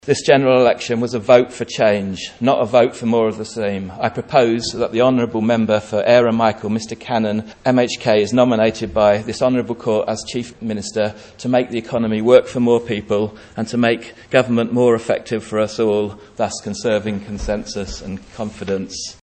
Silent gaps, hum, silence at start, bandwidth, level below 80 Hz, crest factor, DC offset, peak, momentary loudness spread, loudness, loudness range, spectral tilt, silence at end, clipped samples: none; none; 0.05 s; 8.8 kHz; -44 dBFS; 18 dB; under 0.1%; 0 dBFS; 12 LU; -18 LUFS; 4 LU; -5.5 dB/octave; 0.1 s; under 0.1%